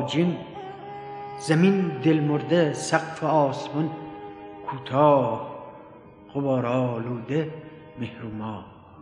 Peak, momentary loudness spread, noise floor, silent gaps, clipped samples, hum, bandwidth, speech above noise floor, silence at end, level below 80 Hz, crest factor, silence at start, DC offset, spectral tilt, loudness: -4 dBFS; 18 LU; -47 dBFS; none; under 0.1%; none; 11.5 kHz; 23 dB; 0 s; -64 dBFS; 20 dB; 0 s; under 0.1%; -6.5 dB/octave; -24 LUFS